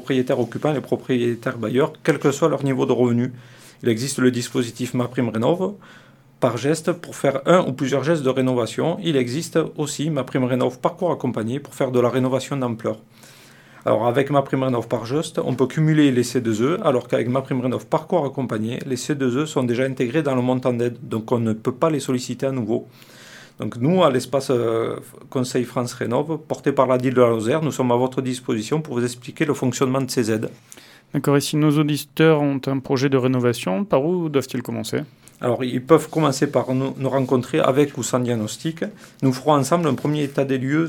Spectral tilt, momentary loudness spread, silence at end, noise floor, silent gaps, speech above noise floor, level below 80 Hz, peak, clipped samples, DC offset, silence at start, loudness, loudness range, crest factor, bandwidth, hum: -6 dB/octave; 8 LU; 0 s; -47 dBFS; none; 26 dB; -64 dBFS; 0 dBFS; under 0.1%; under 0.1%; 0 s; -21 LUFS; 3 LU; 20 dB; 18.5 kHz; none